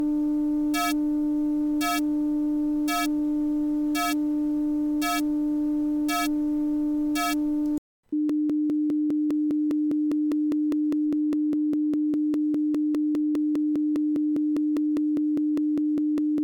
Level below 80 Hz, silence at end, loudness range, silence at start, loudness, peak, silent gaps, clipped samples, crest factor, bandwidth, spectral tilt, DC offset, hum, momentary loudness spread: -54 dBFS; 0 s; 1 LU; 0 s; -25 LUFS; -18 dBFS; 7.78-8.03 s; under 0.1%; 6 dB; 19 kHz; -4 dB/octave; under 0.1%; none; 1 LU